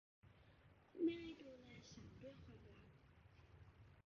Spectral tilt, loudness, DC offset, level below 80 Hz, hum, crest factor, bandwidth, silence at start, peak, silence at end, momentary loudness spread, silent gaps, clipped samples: -6 dB/octave; -51 LUFS; under 0.1%; -72 dBFS; none; 22 dB; 7 kHz; 0.25 s; -32 dBFS; 0.05 s; 25 LU; none; under 0.1%